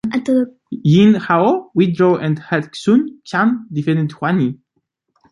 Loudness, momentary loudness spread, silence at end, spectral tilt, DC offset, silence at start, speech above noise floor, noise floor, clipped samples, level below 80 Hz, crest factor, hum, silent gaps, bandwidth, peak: -16 LUFS; 9 LU; 0.75 s; -7.5 dB/octave; under 0.1%; 0.05 s; 54 dB; -69 dBFS; under 0.1%; -58 dBFS; 14 dB; none; none; 11 kHz; -2 dBFS